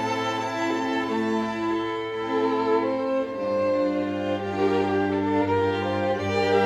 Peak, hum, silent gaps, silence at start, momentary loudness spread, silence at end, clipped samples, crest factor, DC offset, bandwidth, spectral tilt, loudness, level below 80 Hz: -10 dBFS; none; none; 0 s; 4 LU; 0 s; under 0.1%; 14 dB; under 0.1%; 12.5 kHz; -6 dB/octave; -25 LUFS; -62 dBFS